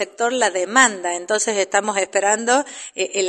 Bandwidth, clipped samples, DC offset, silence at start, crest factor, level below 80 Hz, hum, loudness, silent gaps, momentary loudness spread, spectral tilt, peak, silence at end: 11.5 kHz; under 0.1%; under 0.1%; 0 s; 20 dB; -74 dBFS; none; -18 LUFS; none; 9 LU; -1 dB/octave; 0 dBFS; 0 s